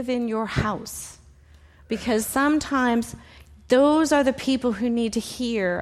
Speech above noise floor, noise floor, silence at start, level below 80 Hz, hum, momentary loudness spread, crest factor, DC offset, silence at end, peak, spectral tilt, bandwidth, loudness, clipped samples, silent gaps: 29 dB; -51 dBFS; 0 s; -48 dBFS; none; 14 LU; 16 dB; under 0.1%; 0 s; -8 dBFS; -4.5 dB/octave; 15 kHz; -23 LUFS; under 0.1%; none